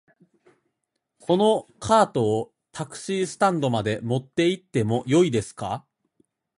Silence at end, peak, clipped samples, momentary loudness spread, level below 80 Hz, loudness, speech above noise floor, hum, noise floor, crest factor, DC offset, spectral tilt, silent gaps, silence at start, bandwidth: 0.8 s; -4 dBFS; under 0.1%; 14 LU; -58 dBFS; -23 LUFS; 56 dB; none; -79 dBFS; 20 dB; under 0.1%; -6 dB/octave; none; 1.3 s; 11.5 kHz